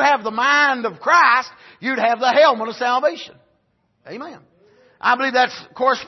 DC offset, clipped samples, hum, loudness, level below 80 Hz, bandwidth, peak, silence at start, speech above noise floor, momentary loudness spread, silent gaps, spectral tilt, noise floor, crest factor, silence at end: under 0.1%; under 0.1%; none; -17 LUFS; -72 dBFS; 6.2 kHz; -2 dBFS; 0 s; 47 dB; 20 LU; none; -2.5 dB/octave; -65 dBFS; 16 dB; 0 s